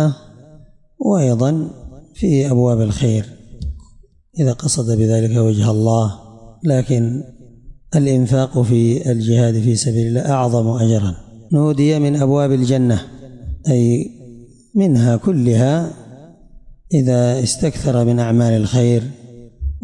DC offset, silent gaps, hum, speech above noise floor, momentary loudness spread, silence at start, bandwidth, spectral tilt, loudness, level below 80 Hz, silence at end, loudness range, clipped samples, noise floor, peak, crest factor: under 0.1%; none; none; 32 dB; 14 LU; 0 s; 11.5 kHz; -7 dB/octave; -16 LUFS; -38 dBFS; 0.05 s; 2 LU; under 0.1%; -46 dBFS; -6 dBFS; 12 dB